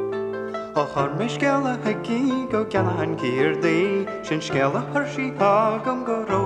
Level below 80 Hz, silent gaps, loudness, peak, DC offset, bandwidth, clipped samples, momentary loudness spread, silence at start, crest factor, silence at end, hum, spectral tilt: -56 dBFS; none; -23 LUFS; -6 dBFS; under 0.1%; 10 kHz; under 0.1%; 7 LU; 0 s; 16 dB; 0 s; none; -6.5 dB/octave